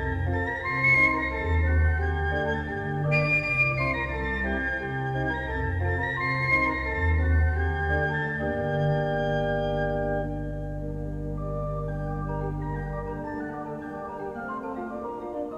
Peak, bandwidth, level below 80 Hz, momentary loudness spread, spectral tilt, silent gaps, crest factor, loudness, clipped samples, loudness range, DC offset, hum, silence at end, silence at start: -10 dBFS; 7.6 kHz; -36 dBFS; 11 LU; -8 dB/octave; none; 16 dB; -27 LUFS; under 0.1%; 8 LU; under 0.1%; none; 0 s; 0 s